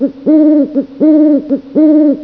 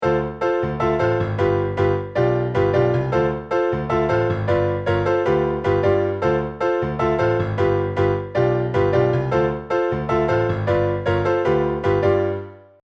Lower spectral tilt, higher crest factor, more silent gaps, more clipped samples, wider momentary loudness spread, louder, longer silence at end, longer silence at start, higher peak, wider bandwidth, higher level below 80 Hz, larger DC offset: first, -10.5 dB/octave vs -8.5 dB/octave; second, 8 dB vs 14 dB; neither; neither; first, 6 LU vs 3 LU; first, -10 LUFS vs -20 LUFS; second, 0 s vs 0.25 s; about the same, 0 s vs 0 s; first, 0 dBFS vs -6 dBFS; second, 2.3 kHz vs 7.2 kHz; second, -54 dBFS vs -40 dBFS; neither